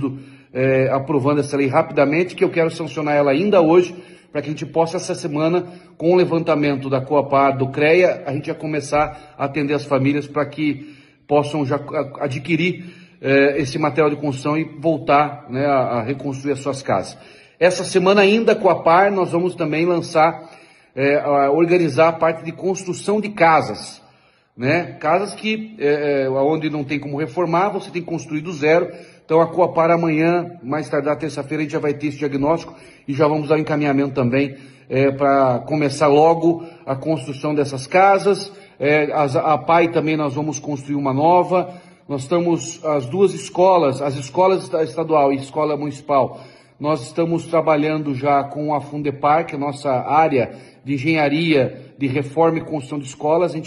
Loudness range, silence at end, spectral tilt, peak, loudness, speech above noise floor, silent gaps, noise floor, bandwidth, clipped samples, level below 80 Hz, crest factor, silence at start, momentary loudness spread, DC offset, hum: 4 LU; 0 s; -6 dB/octave; -2 dBFS; -18 LUFS; 37 dB; none; -55 dBFS; 11.5 kHz; under 0.1%; -58 dBFS; 16 dB; 0 s; 10 LU; under 0.1%; none